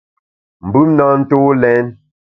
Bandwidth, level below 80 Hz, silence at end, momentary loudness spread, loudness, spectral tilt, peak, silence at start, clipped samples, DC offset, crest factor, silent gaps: 3.9 kHz; -48 dBFS; 0.4 s; 10 LU; -12 LUFS; -11.5 dB/octave; 0 dBFS; 0.65 s; under 0.1%; under 0.1%; 14 dB; none